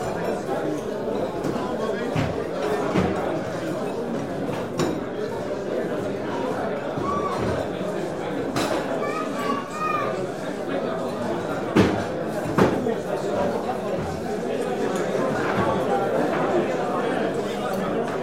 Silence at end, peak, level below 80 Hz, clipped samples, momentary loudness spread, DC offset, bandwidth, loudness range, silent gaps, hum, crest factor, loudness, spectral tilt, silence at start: 0 s; -4 dBFS; -50 dBFS; under 0.1%; 5 LU; 0.4%; 16 kHz; 3 LU; none; none; 20 dB; -25 LUFS; -6 dB/octave; 0 s